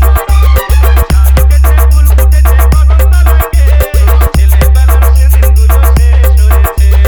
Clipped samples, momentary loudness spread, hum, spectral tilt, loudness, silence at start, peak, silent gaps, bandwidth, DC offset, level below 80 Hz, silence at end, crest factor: 2%; 1 LU; none; -6 dB/octave; -7 LUFS; 0 s; 0 dBFS; none; over 20 kHz; under 0.1%; -4 dBFS; 0 s; 4 dB